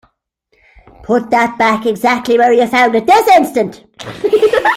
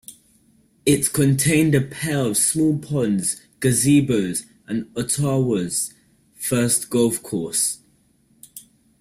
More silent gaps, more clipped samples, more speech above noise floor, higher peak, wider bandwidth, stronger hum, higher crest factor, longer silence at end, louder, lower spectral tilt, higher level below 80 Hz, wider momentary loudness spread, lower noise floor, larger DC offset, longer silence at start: neither; neither; first, 50 dB vs 40 dB; first, 0 dBFS vs -4 dBFS; about the same, 16 kHz vs 16 kHz; neither; about the same, 12 dB vs 16 dB; second, 0 s vs 0.4 s; first, -12 LUFS vs -20 LUFS; about the same, -4.5 dB/octave vs -4.5 dB/octave; about the same, -50 dBFS vs -52 dBFS; about the same, 10 LU vs 12 LU; about the same, -61 dBFS vs -60 dBFS; neither; first, 1.1 s vs 0.1 s